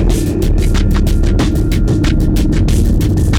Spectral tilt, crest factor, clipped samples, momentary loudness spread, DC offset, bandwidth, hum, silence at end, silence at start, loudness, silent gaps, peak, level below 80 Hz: -6.5 dB/octave; 6 dB; under 0.1%; 2 LU; under 0.1%; 16.5 kHz; none; 0 s; 0 s; -14 LUFS; none; -4 dBFS; -14 dBFS